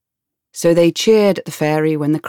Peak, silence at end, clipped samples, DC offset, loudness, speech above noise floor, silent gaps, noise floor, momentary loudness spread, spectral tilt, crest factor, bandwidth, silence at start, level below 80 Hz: -2 dBFS; 0 s; under 0.1%; under 0.1%; -15 LUFS; 67 dB; none; -81 dBFS; 7 LU; -5.5 dB/octave; 14 dB; 18 kHz; 0.55 s; -56 dBFS